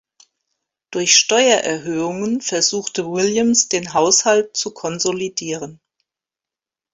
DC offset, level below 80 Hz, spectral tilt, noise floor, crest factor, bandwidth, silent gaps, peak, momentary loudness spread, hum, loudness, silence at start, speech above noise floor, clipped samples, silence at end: under 0.1%; -62 dBFS; -2 dB/octave; -89 dBFS; 20 dB; 8.2 kHz; none; 0 dBFS; 12 LU; none; -17 LUFS; 0.9 s; 71 dB; under 0.1%; 1.2 s